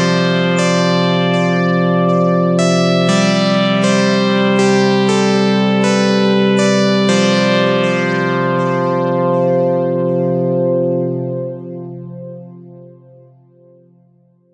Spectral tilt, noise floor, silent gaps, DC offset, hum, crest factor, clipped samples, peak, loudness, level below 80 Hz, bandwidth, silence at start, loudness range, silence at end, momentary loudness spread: -5.5 dB/octave; -52 dBFS; none; under 0.1%; none; 14 dB; under 0.1%; 0 dBFS; -14 LUFS; -62 dBFS; 10.5 kHz; 0 s; 8 LU; 1.7 s; 8 LU